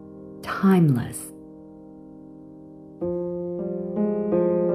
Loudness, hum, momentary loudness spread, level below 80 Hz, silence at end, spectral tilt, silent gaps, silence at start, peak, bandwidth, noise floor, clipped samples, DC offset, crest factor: -24 LUFS; none; 25 LU; -58 dBFS; 0 s; -7.5 dB/octave; none; 0 s; -8 dBFS; 15 kHz; -44 dBFS; under 0.1%; under 0.1%; 16 dB